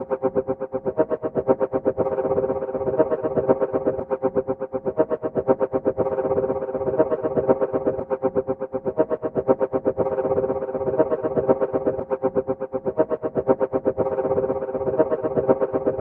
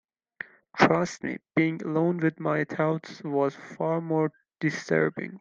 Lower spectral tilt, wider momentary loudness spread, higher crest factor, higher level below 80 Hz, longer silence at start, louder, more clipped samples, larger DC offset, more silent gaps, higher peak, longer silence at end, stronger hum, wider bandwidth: first, -11.5 dB/octave vs -6.5 dB/octave; second, 4 LU vs 10 LU; second, 18 dB vs 24 dB; first, -52 dBFS vs -68 dBFS; second, 0 s vs 0.75 s; first, -23 LUFS vs -27 LUFS; neither; neither; neither; about the same, -4 dBFS vs -2 dBFS; about the same, 0 s vs 0 s; neither; second, 3.2 kHz vs 7.6 kHz